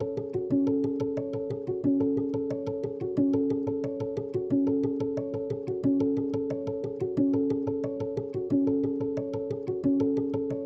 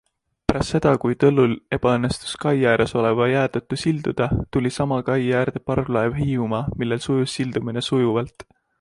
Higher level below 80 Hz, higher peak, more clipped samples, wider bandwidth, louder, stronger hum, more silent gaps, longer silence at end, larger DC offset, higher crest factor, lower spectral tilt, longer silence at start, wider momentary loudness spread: second, -62 dBFS vs -42 dBFS; second, -14 dBFS vs -2 dBFS; neither; second, 6.2 kHz vs 11.5 kHz; second, -29 LUFS vs -21 LUFS; neither; neither; second, 0 s vs 0.4 s; neither; second, 14 dB vs 20 dB; first, -10 dB/octave vs -6.5 dB/octave; second, 0 s vs 0.5 s; about the same, 7 LU vs 7 LU